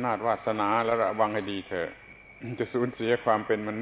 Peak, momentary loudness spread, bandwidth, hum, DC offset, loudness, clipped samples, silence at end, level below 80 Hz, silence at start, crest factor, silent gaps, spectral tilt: -10 dBFS; 13 LU; 4 kHz; none; under 0.1%; -28 LUFS; under 0.1%; 0 s; -62 dBFS; 0 s; 18 dB; none; -9.5 dB/octave